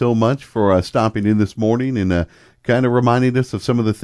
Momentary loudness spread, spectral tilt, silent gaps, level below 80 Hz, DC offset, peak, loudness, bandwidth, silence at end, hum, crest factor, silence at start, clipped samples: 5 LU; -7.5 dB/octave; none; -44 dBFS; under 0.1%; -2 dBFS; -17 LUFS; 11 kHz; 0 s; none; 16 dB; 0 s; under 0.1%